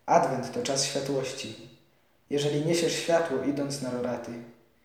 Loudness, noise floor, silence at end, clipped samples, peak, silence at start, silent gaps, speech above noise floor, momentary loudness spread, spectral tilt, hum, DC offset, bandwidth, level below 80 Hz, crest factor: -28 LUFS; -65 dBFS; 0.35 s; under 0.1%; -8 dBFS; 0.05 s; none; 37 dB; 13 LU; -4 dB/octave; none; under 0.1%; 18.5 kHz; -72 dBFS; 20 dB